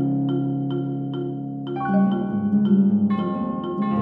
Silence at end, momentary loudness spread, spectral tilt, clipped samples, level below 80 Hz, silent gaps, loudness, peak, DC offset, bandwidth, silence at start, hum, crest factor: 0 s; 10 LU; -11.5 dB/octave; under 0.1%; -60 dBFS; none; -23 LUFS; -8 dBFS; under 0.1%; 4.1 kHz; 0 s; none; 14 dB